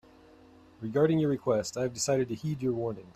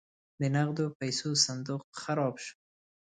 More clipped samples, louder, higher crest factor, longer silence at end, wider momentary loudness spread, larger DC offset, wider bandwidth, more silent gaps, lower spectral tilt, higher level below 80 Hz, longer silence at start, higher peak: neither; about the same, -29 LUFS vs -31 LUFS; about the same, 18 dB vs 22 dB; second, 0.05 s vs 0.55 s; second, 7 LU vs 11 LU; neither; first, 14 kHz vs 9.6 kHz; second, none vs 0.95-1.00 s, 1.84-1.93 s; first, -5.5 dB/octave vs -4 dB/octave; first, -62 dBFS vs -74 dBFS; first, 0.8 s vs 0.4 s; about the same, -12 dBFS vs -10 dBFS